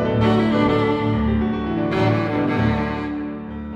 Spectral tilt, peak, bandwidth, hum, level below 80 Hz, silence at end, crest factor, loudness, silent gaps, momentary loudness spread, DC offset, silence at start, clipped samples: -8.5 dB/octave; -6 dBFS; 8 kHz; none; -36 dBFS; 0 s; 14 dB; -20 LUFS; none; 9 LU; under 0.1%; 0 s; under 0.1%